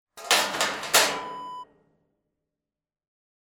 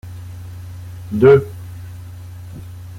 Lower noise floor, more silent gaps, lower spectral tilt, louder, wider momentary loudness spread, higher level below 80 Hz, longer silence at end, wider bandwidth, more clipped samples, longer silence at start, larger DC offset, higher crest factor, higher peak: first, under -90 dBFS vs -33 dBFS; neither; second, 0.5 dB/octave vs -8.5 dB/octave; second, -23 LUFS vs -13 LUFS; second, 18 LU vs 23 LU; second, -68 dBFS vs -46 dBFS; first, 1.9 s vs 0 s; first, 19 kHz vs 15 kHz; neither; about the same, 0.15 s vs 0.05 s; neither; first, 24 dB vs 18 dB; about the same, -4 dBFS vs -2 dBFS